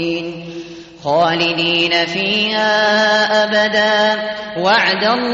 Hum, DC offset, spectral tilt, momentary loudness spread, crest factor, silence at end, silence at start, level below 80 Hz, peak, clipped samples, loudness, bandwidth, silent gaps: none; under 0.1%; -1 dB/octave; 14 LU; 12 dB; 0 s; 0 s; -56 dBFS; -2 dBFS; under 0.1%; -14 LUFS; 7.8 kHz; none